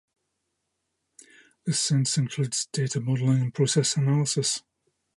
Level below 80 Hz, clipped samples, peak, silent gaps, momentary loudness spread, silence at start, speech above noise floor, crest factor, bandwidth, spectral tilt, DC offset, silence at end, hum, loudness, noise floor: -70 dBFS; under 0.1%; -10 dBFS; none; 5 LU; 1.65 s; 55 dB; 18 dB; 11.5 kHz; -4.5 dB/octave; under 0.1%; 0.6 s; none; -25 LUFS; -79 dBFS